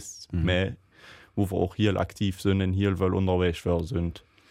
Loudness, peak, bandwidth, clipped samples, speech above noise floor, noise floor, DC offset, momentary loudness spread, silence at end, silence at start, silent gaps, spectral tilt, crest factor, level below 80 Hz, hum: -27 LUFS; -10 dBFS; 14 kHz; under 0.1%; 26 dB; -52 dBFS; under 0.1%; 8 LU; 0.3 s; 0 s; none; -6.5 dB/octave; 16 dB; -44 dBFS; none